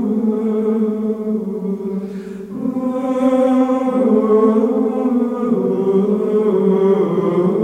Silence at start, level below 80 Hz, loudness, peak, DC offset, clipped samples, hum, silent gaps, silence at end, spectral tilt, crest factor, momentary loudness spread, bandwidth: 0 s; -58 dBFS; -17 LUFS; -2 dBFS; under 0.1%; under 0.1%; none; none; 0 s; -9.5 dB/octave; 14 dB; 9 LU; 9 kHz